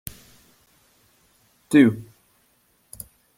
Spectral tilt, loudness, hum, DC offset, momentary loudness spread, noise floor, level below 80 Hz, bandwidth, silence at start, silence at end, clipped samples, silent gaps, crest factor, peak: -6 dB/octave; -18 LUFS; none; under 0.1%; 24 LU; -64 dBFS; -60 dBFS; 16 kHz; 1.7 s; 1.35 s; under 0.1%; none; 22 dB; -4 dBFS